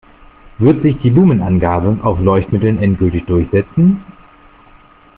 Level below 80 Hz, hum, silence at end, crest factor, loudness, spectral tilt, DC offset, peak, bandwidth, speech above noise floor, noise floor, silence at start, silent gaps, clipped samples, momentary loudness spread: -36 dBFS; none; 1.05 s; 12 dB; -13 LUFS; -9 dB/octave; under 0.1%; 0 dBFS; 3.9 kHz; 32 dB; -44 dBFS; 0.6 s; none; under 0.1%; 5 LU